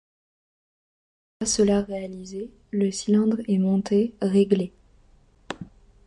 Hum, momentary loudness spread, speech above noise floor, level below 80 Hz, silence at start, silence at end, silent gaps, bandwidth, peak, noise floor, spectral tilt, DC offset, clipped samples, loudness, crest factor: none; 16 LU; 34 dB; -54 dBFS; 1.4 s; 0.4 s; none; 11.5 kHz; -8 dBFS; -57 dBFS; -5.5 dB/octave; under 0.1%; under 0.1%; -23 LUFS; 18 dB